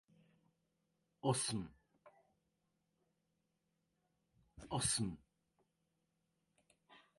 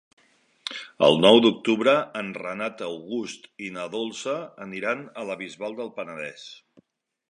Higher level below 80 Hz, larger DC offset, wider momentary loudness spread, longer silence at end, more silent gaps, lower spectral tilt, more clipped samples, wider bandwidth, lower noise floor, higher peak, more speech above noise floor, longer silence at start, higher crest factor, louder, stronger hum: about the same, -68 dBFS vs -72 dBFS; neither; about the same, 19 LU vs 19 LU; second, 0.2 s vs 0.75 s; neither; about the same, -3.5 dB/octave vs -4.5 dB/octave; neither; about the same, 11.5 kHz vs 11 kHz; first, -85 dBFS vs -63 dBFS; second, -24 dBFS vs -2 dBFS; first, 46 dB vs 38 dB; first, 1.25 s vs 0.65 s; about the same, 24 dB vs 24 dB; second, -40 LUFS vs -24 LUFS; neither